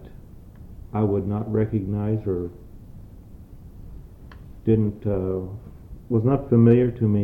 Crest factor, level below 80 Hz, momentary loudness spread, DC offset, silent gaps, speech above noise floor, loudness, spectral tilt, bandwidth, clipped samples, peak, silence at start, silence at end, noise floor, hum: 18 dB; -44 dBFS; 27 LU; under 0.1%; none; 22 dB; -23 LUFS; -11.5 dB/octave; 3.6 kHz; under 0.1%; -6 dBFS; 0 s; 0 s; -43 dBFS; none